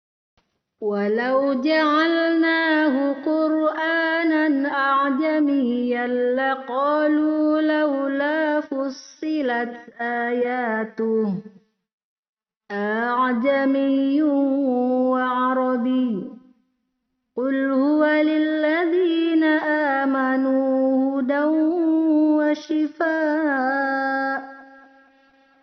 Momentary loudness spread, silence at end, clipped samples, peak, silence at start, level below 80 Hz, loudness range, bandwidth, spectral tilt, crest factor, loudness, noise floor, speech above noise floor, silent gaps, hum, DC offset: 7 LU; 1 s; under 0.1%; -8 dBFS; 0.8 s; -72 dBFS; 5 LU; 6.2 kHz; -3 dB/octave; 14 dB; -21 LUFS; -76 dBFS; 55 dB; 11.93-11.98 s, 12.04-12.23 s, 12.29-12.33 s; none; under 0.1%